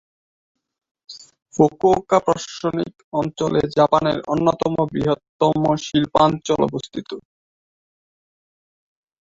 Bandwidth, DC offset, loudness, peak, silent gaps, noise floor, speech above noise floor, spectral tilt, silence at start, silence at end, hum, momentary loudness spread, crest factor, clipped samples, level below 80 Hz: 7.8 kHz; under 0.1%; -19 LUFS; -2 dBFS; 3.04-3.12 s, 5.29-5.40 s; under -90 dBFS; over 71 dB; -6 dB/octave; 1.1 s; 2 s; none; 15 LU; 20 dB; under 0.1%; -52 dBFS